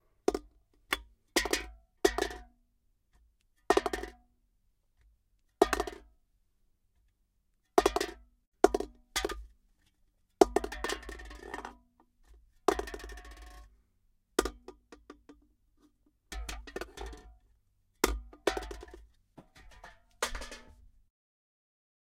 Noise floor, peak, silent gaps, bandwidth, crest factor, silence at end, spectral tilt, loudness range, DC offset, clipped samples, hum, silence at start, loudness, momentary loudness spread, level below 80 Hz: -75 dBFS; -4 dBFS; 8.47-8.52 s; 16.5 kHz; 34 dB; 1.45 s; -3.5 dB/octave; 9 LU; under 0.1%; under 0.1%; none; 0.3 s; -33 LUFS; 22 LU; -50 dBFS